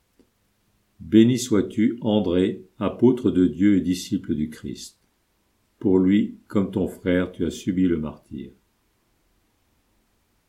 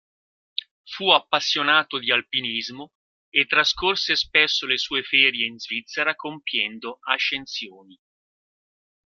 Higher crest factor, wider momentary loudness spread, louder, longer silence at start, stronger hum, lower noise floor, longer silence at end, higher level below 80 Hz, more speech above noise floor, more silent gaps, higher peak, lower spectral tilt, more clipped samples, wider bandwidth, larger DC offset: about the same, 20 dB vs 24 dB; first, 17 LU vs 14 LU; about the same, -22 LUFS vs -21 LUFS; first, 1 s vs 0.85 s; neither; second, -68 dBFS vs under -90 dBFS; first, 2 s vs 1.35 s; first, -52 dBFS vs -60 dBFS; second, 46 dB vs over 67 dB; second, none vs 2.95-3.32 s; about the same, -4 dBFS vs -2 dBFS; first, -6.5 dB/octave vs -1.5 dB/octave; neither; about the same, 14.5 kHz vs 13.5 kHz; neither